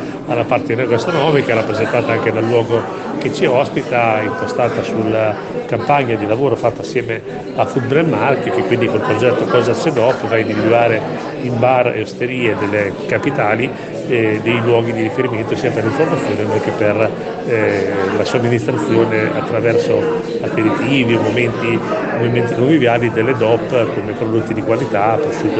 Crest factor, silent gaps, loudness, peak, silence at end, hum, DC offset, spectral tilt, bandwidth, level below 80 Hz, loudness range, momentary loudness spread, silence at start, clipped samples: 14 dB; none; -16 LUFS; 0 dBFS; 0 s; none; under 0.1%; -7 dB/octave; 8.6 kHz; -50 dBFS; 2 LU; 6 LU; 0 s; under 0.1%